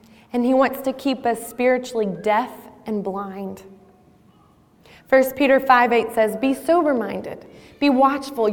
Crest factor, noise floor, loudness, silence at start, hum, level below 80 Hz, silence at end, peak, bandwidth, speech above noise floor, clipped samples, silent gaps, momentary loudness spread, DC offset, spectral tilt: 18 dB; -54 dBFS; -20 LUFS; 0.35 s; none; -58 dBFS; 0 s; -4 dBFS; 18.5 kHz; 35 dB; under 0.1%; none; 16 LU; under 0.1%; -5 dB/octave